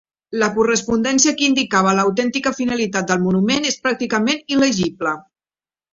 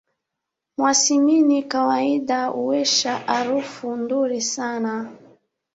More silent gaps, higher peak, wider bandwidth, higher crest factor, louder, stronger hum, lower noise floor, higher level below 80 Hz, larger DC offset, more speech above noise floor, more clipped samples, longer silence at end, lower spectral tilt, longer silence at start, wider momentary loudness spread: neither; about the same, -2 dBFS vs -4 dBFS; about the same, 7.8 kHz vs 8 kHz; about the same, 16 dB vs 18 dB; first, -17 LUFS vs -20 LUFS; neither; first, under -90 dBFS vs -83 dBFS; first, -54 dBFS vs -68 dBFS; neither; first, over 72 dB vs 62 dB; neither; about the same, 0.7 s vs 0.6 s; first, -3.5 dB/octave vs -2 dB/octave; second, 0.3 s vs 0.8 s; second, 6 LU vs 11 LU